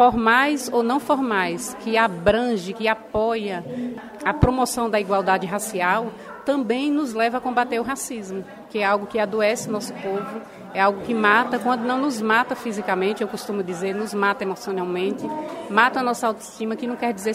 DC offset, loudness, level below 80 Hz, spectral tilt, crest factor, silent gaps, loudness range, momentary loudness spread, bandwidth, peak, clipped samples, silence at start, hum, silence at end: under 0.1%; -22 LUFS; -46 dBFS; -4.5 dB/octave; 22 dB; none; 3 LU; 10 LU; 16 kHz; 0 dBFS; under 0.1%; 0 s; none; 0 s